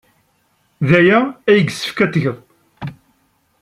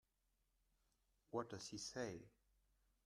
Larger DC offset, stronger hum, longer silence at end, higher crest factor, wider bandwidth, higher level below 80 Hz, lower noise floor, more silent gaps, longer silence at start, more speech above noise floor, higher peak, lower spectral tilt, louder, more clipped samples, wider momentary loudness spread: neither; neither; about the same, 0.7 s vs 0.75 s; second, 16 dB vs 24 dB; about the same, 14 kHz vs 13.5 kHz; first, -56 dBFS vs -80 dBFS; second, -61 dBFS vs -85 dBFS; neither; second, 0.8 s vs 1.3 s; first, 47 dB vs 36 dB; first, -2 dBFS vs -30 dBFS; first, -6.5 dB/octave vs -4 dB/octave; first, -15 LUFS vs -50 LUFS; neither; first, 21 LU vs 9 LU